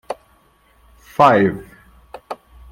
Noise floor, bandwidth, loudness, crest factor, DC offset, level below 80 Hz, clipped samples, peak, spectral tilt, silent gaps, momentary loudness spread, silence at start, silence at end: -55 dBFS; 16.5 kHz; -15 LUFS; 20 dB; under 0.1%; -50 dBFS; under 0.1%; 0 dBFS; -7 dB/octave; none; 22 LU; 0.1 s; 0.4 s